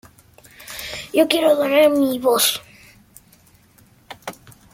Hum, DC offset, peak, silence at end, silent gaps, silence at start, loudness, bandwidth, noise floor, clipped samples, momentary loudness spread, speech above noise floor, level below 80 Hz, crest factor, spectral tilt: none; under 0.1%; -2 dBFS; 0.4 s; none; 0.6 s; -17 LUFS; 17 kHz; -53 dBFS; under 0.1%; 20 LU; 37 dB; -58 dBFS; 20 dB; -2.5 dB/octave